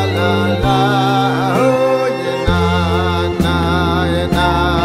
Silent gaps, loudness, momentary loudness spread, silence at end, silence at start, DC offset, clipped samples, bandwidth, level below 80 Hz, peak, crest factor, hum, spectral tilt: none; -14 LUFS; 3 LU; 0 s; 0 s; under 0.1%; under 0.1%; 15.5 kHz; -28 dBFS; -2 dBFS; 12 dB; none; -6.5 dB/octave